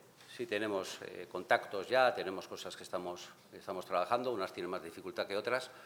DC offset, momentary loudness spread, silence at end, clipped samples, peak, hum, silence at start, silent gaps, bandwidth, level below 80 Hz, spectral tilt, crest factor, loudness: under 0.1%; 14 LU; 0 s; under 0.1%; -14 dBFS; none; 0.05 s; none; 19 kHz; -86 dBFS; -3.5 dB/octave; 24 dB; -37 LUFS